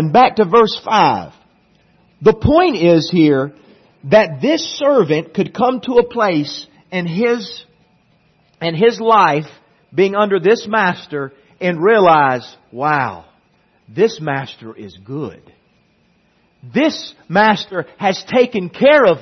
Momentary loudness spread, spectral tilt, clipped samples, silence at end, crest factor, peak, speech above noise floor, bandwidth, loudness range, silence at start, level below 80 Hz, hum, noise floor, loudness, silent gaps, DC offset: 16 LU; -6 dB/octave; under 0.1%; 0 s; 16 dB; 0 dBFS; 43 dB; 6.4 kHz; 8 LU; 0 s; -48 dBFS; none; -57 dBFS; -15 LUFS; none; under 0.1%